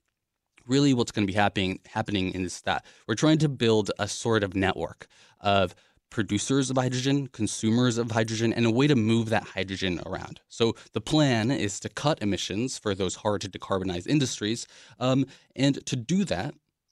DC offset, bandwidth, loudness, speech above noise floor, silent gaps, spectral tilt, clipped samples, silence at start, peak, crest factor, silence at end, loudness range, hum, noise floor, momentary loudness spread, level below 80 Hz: under 0.1%; 12.5 kHz; -27 LUFS; 55 dB; none; -5 dB/octave; under 0.1%; 0.65 s; -6 dBFS; 20 dB; 0.4 s; 3 LU; none; -81 dBFS; 9 LU; -58 dBFS